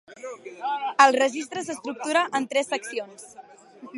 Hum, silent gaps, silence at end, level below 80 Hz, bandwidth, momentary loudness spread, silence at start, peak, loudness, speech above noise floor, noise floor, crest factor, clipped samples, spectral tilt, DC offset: none; none; 0 s; -78 dBFS; 11.5 kHz; 21 LU; 0.1 s; -2 dBFS; -24 LUFS; 20 dB; -45 dBFS; 24 dB; under 0.1%; -2 dB/octave; under 0.1%